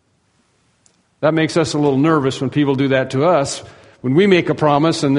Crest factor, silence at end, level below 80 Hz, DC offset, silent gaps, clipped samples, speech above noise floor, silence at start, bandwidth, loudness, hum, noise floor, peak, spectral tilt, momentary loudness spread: 16 dB; 0 s; -54 dBFS; under 0.1%; none; under 0.1%; 46 dB; 1.2 s; 10.5 kHz; -16 LUFS; none; -61 dBFS; 0 dBFS; -6 dB/octave; 6 LU